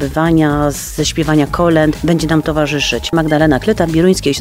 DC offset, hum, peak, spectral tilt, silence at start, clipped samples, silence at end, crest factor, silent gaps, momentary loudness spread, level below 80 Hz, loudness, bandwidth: 0.1%; none; 0 dBFS; -5.5 dB/octave; 0 s; under 0.1%; 0 s; 12 dB; none; 4 LU; -30 dBFS; -13 LUFS; 16 kHz